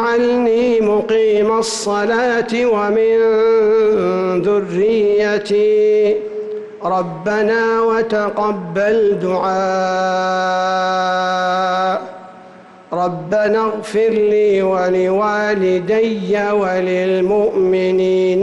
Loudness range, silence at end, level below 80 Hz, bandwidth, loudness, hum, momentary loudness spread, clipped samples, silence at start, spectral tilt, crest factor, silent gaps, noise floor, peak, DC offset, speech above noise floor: 3 LU; 0 s; -54 dBFS; 11.5 kHz; -15 LUFS; none; 6 LU; under 0.1%; 0 s; -5.5 dB/octave; 8 dB; none; -40 dBFS; -8 dBFS; under 0.1%; 25 dB